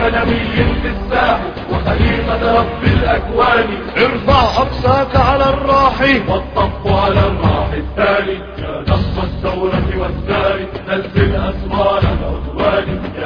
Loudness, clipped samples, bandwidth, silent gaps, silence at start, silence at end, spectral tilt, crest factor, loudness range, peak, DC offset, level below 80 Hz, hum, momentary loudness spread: -15 LUFS; under 0.1%; 5.4 kHz; none; 0 s; 0 s; -7.5 dB/octave; 14 dB; 4 LU; 0 dBFS; under 0.1%; -24 dBFS; none; 8 LU